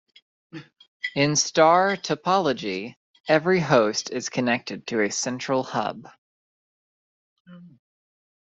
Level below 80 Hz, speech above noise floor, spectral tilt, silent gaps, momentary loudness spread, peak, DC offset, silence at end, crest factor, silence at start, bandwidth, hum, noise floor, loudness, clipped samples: -66 dBFS; over 67 dB; -4 dB/octave; 0.88-1.00 s, 2.97-3.14 s, 3.20-3.24 s, 6.18-7.45 s; 21 LU; -4 dBFS; under 0.1%; 0.85 s; 20 dB; 0.55 s; 8.2 kHz; none; under -90 dBFS; -23 LUFS; under 0.1%